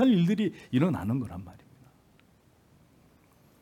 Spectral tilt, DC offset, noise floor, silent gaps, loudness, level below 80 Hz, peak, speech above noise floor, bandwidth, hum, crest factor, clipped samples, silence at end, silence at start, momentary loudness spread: -8 dB/octave; under 0.1%; -62 dBFS; none; -28 LUFS; -66 dBFS; -12 dBFS; 35 dB; 14 kHz; none; 18 dB; under 0.1%; 2.1 s; 0 s; 18 LU